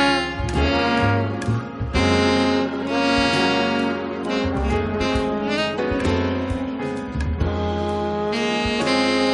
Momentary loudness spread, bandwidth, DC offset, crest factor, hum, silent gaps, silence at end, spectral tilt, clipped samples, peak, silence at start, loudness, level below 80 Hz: 7 LU; 11.5 kHz; under 0.1%; 14 dB; none; none; 0 s; -5.5 dB/octave; under 0.1%; -6 dBFS; 0 s; -21 LUFS; -34 dBFS